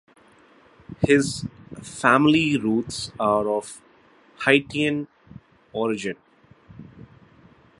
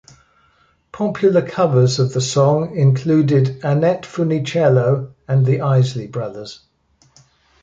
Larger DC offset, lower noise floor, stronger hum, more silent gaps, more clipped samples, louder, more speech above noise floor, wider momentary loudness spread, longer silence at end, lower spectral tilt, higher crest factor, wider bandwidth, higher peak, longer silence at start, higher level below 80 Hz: neither; about the same, -55 dBFS vs -58 dBFS; neither; neither; neither; second, -22 LUFS vs -17 LUFS; second, 34 dB vs 42 dB; first, 20 LU vs 10 LU; second, 0.8 s vs 1.1 s; second, -5 dB/octave vs -7 dB/octave; first, 24 dB vs 14 dB; first, 11.5 kHz vs 7.8 kHz; about the same, -2 dBFS vs -2 dBFS; about the same, 0.9 s vs 0.95 s; about the same, -54 dBFS vs -56 dBFS